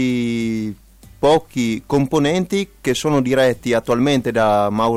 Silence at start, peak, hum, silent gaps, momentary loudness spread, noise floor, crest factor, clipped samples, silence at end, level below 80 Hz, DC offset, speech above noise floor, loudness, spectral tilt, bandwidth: 0 s; -4 dBFS; none; none; 6 LU; -41 dBFS; 14 dB; under 0.1%; 0 s; -46 dBFS; under 0.1%; 24 dB; -18 LUFS; -5.5 dB/octave; 15.5 kHz